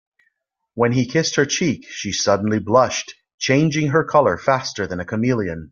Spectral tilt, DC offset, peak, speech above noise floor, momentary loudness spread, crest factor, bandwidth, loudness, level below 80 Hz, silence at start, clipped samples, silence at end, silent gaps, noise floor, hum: -4.5 dB/octave; under 0.1%; -2 dBFS; 52 dB; 9 LU; 18 dB; 7.4 kHz; -19 LUFS; -54 dBFS; 0.75 s; under 0.1%; 0.05 s; 3.34-3.38 s; -71 dBFS; none